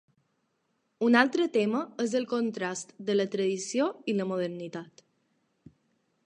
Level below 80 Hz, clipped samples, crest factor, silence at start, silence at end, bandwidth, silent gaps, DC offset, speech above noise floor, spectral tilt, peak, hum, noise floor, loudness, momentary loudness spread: -80 dBFS; under 0.1%; 24 dB; 1 s; 1.4 s; 10 kHz; none; under 0.1%; 48 dB; -4.5 dB/octave; -6 dBFS; none; -76 dBFS; -28 LUFS; 12 LU